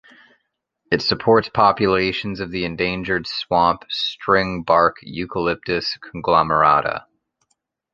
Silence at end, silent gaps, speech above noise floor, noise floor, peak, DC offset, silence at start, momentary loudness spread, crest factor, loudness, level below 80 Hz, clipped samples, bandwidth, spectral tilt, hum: 0.95 s; none; 54 dB; -73 dBFS; -2 dBFS; under 0.1%; 0.9 s; 11 LU; 18 dB; -19 LUFS; -48 dBFS; under 0.1%; 7.6 kHz; -6 dB/octave; none